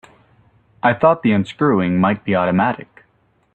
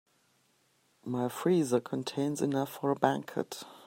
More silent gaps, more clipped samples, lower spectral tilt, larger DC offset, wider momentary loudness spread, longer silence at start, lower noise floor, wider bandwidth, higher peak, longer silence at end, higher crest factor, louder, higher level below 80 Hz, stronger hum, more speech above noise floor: neither; neither; first, -8.5 dB/octave vs -6 dB/octave; neither; second, 5 LU vs 9 LU; second, 0.85 s vs 1.05 s; second, -60 dBFS vs -71 dBFS; second, 8.2 kHz vs 16 kHz; first, -2 dBFS vs -8 dBFS; first, 0.8 s vs 0 s; second, 18 dB vs 24 dB; first, -17 LUFS vs -32 LUFS; first, -54 dBFS vs -78 dBFS; neither; first, 44 dB vs 40 dB